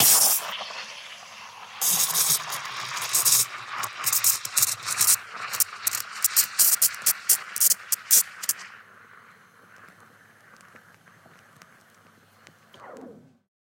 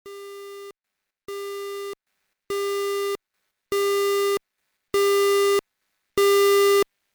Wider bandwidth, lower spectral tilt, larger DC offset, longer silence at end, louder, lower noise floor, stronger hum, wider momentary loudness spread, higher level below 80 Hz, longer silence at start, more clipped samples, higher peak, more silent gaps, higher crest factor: second, 17 kHz vs over 20 kHz; second, 1.5 dB/octave vs -1.5 dB/octave; neither; first, 0.55 s vs 0.3 s; about the same, -21 LUFS vs -22 LUFS; second, -57 dBFS vs -83 dBFS; neither; second, 16 LU vs 21 LU; second, -84 dBFS vs -64 dBFS; about the same, 0 s vs 0.05 s; neither; first, -2 dBFS vs -14 dBFS; neither; first, 24 dB vs 10 dB